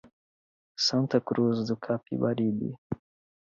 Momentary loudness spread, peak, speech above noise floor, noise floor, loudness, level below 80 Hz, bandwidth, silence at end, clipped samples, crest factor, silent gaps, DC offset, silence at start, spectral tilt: 13 LU; -10 dBFS; over 62 dB; under -90 dBFS; -28 LUFS; -64 dBFS; 7.6 kHz; 0.45 s; under 0.1%; 20 dB; 2.78-2.90 s; under 0.1%; 0.8 s; -5.5 dB/octave